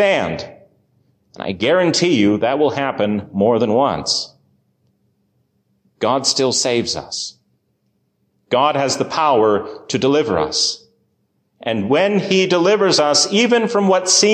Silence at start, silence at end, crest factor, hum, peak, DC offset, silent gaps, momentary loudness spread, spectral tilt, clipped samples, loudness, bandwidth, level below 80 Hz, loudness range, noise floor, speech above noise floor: 0 s; 0 s; 14 dB; none; -4 dBFS; under 0.1%; none; 11 LU; -3.5 dB/octave; under 0.1%; -16 LUFS; 13.5 kHz; -52 dBFS; 5 LU; -66 dBFS; 50 dB